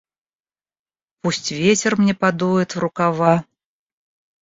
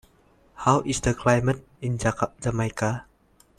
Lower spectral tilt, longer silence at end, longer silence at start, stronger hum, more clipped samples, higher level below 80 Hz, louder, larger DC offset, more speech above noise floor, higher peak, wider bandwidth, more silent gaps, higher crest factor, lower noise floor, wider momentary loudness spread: about the same, -5 dB/octave vs -5.5 dB/octave; first, 1 s vs 0.55 s; first, 1.25 s vs 0.55 s; neither; neither; second, -58 dBFS vs -46 dBFS; first, -19 LUFS vs -25 LUFS; neither; first, over 72 dB vs 36 dB; about the same, -2 dBFS vs -4 dBFS; second, 7.8 kHz vs 13 kHz; neither; about the same, 18 dB vs 22 dB; first, under -90 dBFS vs -60 dBFS; about the same, 7 LU vs 8 LU